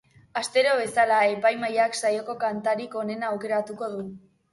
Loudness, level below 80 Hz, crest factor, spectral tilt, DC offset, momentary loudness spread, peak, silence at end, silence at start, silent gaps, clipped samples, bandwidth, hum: -25 LUFS; -70 dBFS; 16 dB; -3.5 dB/octave; under 0.1%; 12 LU; -10 dBFS; 0.35 s; 0.35 s; none; under 0.1%; 11.5 kHz; none